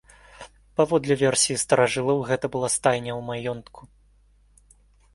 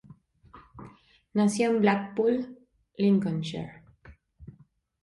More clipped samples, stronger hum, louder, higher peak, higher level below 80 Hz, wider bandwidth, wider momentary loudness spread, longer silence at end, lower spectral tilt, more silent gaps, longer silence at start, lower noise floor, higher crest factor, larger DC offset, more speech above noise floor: neither; first, 50 Hz at -55 dBFS vs none; first, -23 LUFS vs -27 LUFS; first, -4 dBFS vs -12 dBFS; first, -56 dBFS vs -62 dBFS; about the same, 11.5 kHz vs 11.5 kHz; second, 11 LU vs 24 LU; first, 1.35 s vs 0.6 s; second, -3.5 dB/octave vs -6.5 dB/octave; neither; second, 0.4 s vs 0.55 s; about the same, -58 dBFS vs -60 dBFS; about the same, 22 dB vs 18 dB; neither; about the same, 35 dB vs 35 dB